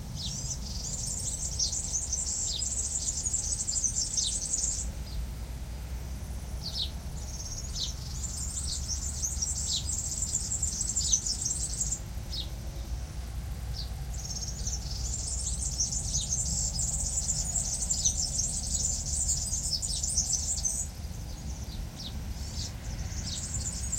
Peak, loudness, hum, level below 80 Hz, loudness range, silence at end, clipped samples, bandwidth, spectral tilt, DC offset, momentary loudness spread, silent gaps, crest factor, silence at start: -12 dBFS; -31 LUFS; none; -38 dBFS; 7 LU; 0 s; under 0.1%; 16.5 kHz; -2 dB/octave; under 0.1%; 12 LU; none; 20 dB; 0 s